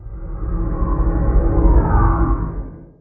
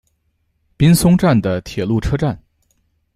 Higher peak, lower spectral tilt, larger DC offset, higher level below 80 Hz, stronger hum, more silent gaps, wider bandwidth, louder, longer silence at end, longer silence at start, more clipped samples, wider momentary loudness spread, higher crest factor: about the same, -2 dBFS vs -2 dBFS; first, -15 dB/octave vs -6.5 dB/octave; neither; first, -18 dBFS vs -34 dBFS; neither; neither; second, 2.3 kHz vs 15 kHz; second, -19 LUFS vs -15 LUFS; second, 0.15 s vs 0.8 s; second, 0 s vs 0.8 s; neither; first, 15 LU vs 10 LU; about the same, 14 dB vs 14 dB